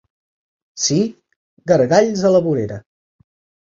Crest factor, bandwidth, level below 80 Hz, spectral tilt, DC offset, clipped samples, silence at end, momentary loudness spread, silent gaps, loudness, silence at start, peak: 18 dB; 7.8 kHz; -56 dBFS; -5 dB/octave; under 0.1%; under 0.1%; 0.9 s; 14 LU; 1.36-1.57 s; -17 LUFS; 0.75 s; -2 dBFS